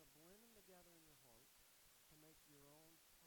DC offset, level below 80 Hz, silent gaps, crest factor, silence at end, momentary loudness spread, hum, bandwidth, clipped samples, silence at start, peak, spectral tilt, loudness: under 0.1%; -84 dBFS; none; 14 dB; 0 s; 2 LU; none; 19 kHz; under 0.1%; 0 s; -54 dBFS; -2.5 dB/octave; -68 LUFS